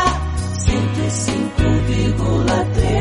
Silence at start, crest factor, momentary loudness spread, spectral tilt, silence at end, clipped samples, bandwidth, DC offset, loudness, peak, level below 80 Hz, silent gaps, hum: 0 s; 14 dB; 3 LU; -5.5 dB/octave; 0 s; under 0.1%; 11.5 kHz; under 0.1%; -18 LUFS; -2 dBFS; -24 dBFS; none; none